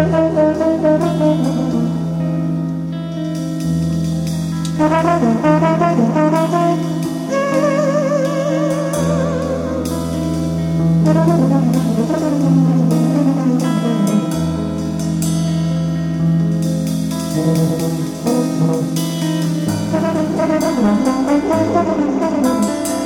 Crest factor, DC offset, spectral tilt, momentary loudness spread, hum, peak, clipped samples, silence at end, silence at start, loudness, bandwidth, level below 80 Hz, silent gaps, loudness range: 14 dB; under 0.1%; -7 dB/octave; 6 LU; none; 0 dBFS; under 0.1%; 0 s; 0 s; -16 LUFS; 16.5 kHz; -42 dBFS; none; 3 LU